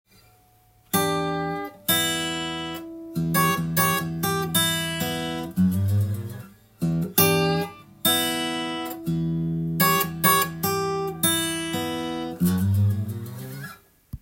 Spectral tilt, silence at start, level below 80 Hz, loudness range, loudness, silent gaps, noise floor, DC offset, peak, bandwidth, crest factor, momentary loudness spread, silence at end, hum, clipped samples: -4 dB/octave; 0.95 s; -56 dBFS; 2 LU; -24 LUFS; none; -58 dBFS; under 0.1%; -2 dBFS; 17 kHz; 22 dB; 13 LU; 0.05 s; none; under 0.1%